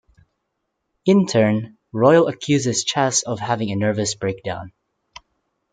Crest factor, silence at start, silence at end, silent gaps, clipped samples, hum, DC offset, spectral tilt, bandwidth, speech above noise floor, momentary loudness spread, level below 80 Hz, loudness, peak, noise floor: 20 dB; 1.05 s; 1.05 s; none; under 0.1%; none; under 0.1%; -4.5 dB/octave; 9.6 kHz; 57 dB; 11 LU; -60 dBFS; -19 LUFS; 0 dBFS; -75 dBFS